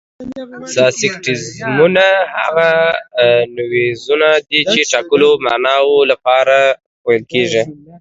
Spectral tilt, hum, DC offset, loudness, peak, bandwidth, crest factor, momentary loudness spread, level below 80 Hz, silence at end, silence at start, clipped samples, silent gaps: -3.5 dB/octave; none; under 0.1%; -13 LUFS; 0 dBFS; 8 kHz; 14 dB; 9 LU; -56 dBFS; 0.05 s; 0.2 s; under 0.1%; 6.86-7.04 s